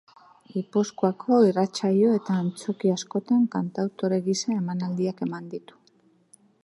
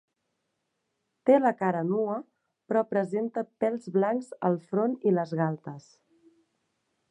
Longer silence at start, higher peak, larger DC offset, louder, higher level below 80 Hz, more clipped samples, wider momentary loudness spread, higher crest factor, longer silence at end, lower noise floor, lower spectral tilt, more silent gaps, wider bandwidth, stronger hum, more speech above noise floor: second, 0.55 s vs 1.25 s; about the same, -8 dBFS vs -10 dBFS; neither; first, -25 LUFS vs -28 LUFS; first, -74 dBFS vs -80 dBFS; neither; about the same, 11 LU vs 10 LU; about the same, 18 dB vs 20 dB; second, 1.05 s vs 1.3 s; second, -62 dBFS vs -80 dBFS; second, -6.5 dB/octave vs -9 dB/octave; neither; about the same, 11.5 kHz vs 10.5 kHz; neither; second, 38 dB vs 53 dB